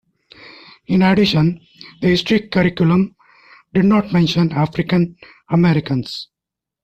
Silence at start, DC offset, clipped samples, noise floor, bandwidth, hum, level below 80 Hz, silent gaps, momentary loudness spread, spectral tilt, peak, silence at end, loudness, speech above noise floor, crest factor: 0.45 s; under 0.1%; under 0.1%; -85 dBFS; 8.2 kHz; none; -48 dBFS; none; 9 LU; -7.5 dB/octave; -4 dBFS; 0.6 s; -16 LUFS; 70 dB; 14 dB